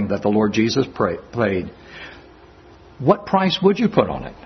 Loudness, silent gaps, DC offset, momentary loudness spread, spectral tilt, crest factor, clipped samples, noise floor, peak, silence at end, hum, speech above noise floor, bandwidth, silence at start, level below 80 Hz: -19 LUFS; none; under 0.1%; 19 LU; -6.5 dB/octave; 20 dB; under 0.1%; -46 dBFS; 0 dBFS; 0.05 s; none; 26 dB; 6.4 kHz; 0 s; -48 dBFS